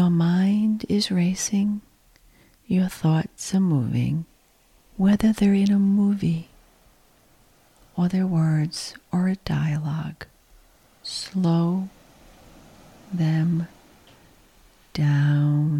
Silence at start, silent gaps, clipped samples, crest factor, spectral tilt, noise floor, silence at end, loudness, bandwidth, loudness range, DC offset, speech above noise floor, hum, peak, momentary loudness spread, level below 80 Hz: 0 s; none; under 0.1%; 16 dB; -6.5 dB/octave; -59 dBFS; 0 s; -23 LUFS; 13.5 kHz; 6 LU; under 0.1%; 37 dB; none; -8 dBFS; 14 LU; -52 dBFS